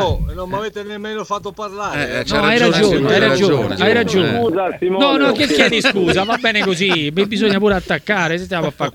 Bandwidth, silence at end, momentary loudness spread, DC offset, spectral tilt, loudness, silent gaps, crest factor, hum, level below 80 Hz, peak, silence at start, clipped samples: 18 kHz; 0.05 s; 11 LU; under 0.1%; -5 dB/octave; -15 LUFS; none; 16 dB; none; -36 dBFS; 0 dBFS; 0 s; under 0.1%